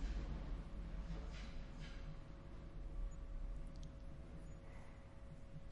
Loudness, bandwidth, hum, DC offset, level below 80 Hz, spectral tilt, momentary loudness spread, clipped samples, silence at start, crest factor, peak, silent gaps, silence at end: -54 LUFS; 10.5 kHz; none; under 0.1%; -50 dBFS; -6.5 dB/octave; 8 LU; under 0.1%; 0 s; 14 dB; -34 dBFS; none; 0 s